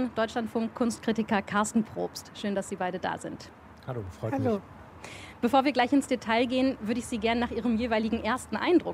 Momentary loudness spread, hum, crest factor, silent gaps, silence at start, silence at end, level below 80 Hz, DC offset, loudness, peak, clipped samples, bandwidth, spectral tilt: 15 LU; none; 18 dB; none; 0 s; 0 s; -56 dBFS; under 0.1%; -29 LUFS; -10 dBFS; under 0.1%; 15 kHz; -5 dB/octave